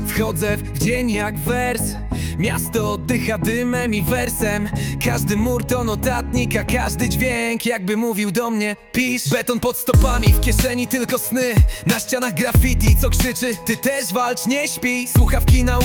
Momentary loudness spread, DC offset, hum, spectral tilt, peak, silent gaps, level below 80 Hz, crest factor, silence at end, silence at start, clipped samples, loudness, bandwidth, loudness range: 5 LU; under 0.1%; none; -5 dB/octave; -2 dBFS; none; -24 dBFS; 16 dB; 0 s; 0 s; under 0.1%; -19 LUFS; 19 kHz; 3 LU